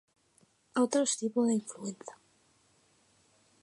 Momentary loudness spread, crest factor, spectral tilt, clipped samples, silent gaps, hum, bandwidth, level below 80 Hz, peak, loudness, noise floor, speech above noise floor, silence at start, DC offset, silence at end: 16 LU; 20 dB; -4 dB/octave; under 0.1%; none; none; 11.5 kHz; -86 dBFS; -16 dBFS; -31 LUFS; -69 dBFS; 38 dB; 0.75 s; under 0.1%; 1.5 s